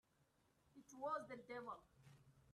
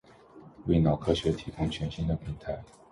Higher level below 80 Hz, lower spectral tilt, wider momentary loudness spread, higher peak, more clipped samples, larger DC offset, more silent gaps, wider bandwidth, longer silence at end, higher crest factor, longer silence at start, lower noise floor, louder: second, -84 dBFS vs -44 dBFS; second, -5 dB/octave vs -7.5 dB/octave; first, 21 LU vs 13 LU; second, -36 dBFS vs -10 dBFS; neither; neither; neither; first, 13 kHz vs 11.5 kHz; second, 0 s vs 0.25 s; about the same, 18 dB vs 20 dB; first, 0.65 s vs 0.35 s; first, -80 dBFS vs -52 dBFS; second, -51 LUFS vs -30 LUFS